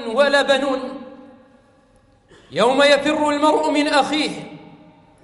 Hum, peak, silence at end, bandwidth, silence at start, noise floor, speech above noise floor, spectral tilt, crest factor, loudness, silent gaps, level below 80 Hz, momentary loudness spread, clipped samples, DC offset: none; -2 dBFS; 0.6 s; 11.5 kHz; 0 s; -55 dBFS; 38 dB; -3.5 dB/octave; 18 dB; -17 LUFS; none; -58 dBFS; 17 LU; under 0.1%; under 0.1%